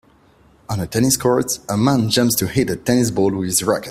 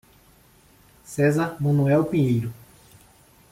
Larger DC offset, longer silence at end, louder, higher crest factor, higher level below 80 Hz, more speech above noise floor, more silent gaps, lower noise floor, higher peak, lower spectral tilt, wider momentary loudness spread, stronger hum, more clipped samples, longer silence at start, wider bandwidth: neither; second, 0 s vs 1 s; first, -18 LUFS vs -22 LUFS; about the same, 18 dB vs 16 dB; first, -48 dBFS vs -56 dBFS; about the same, 35 dB vs 34 dB; neither; about the same, -52 dBFS vs -55 dBFS; first, -2 dBFS vs -8 dBFS; second, -4.5 dB/octave vs -8 dB/octave; second, 5 LU vs 10 LU; neither; neither; second, 0.7 s vs 1.1 s; about the same, 16 kHz vs 15.5 kHz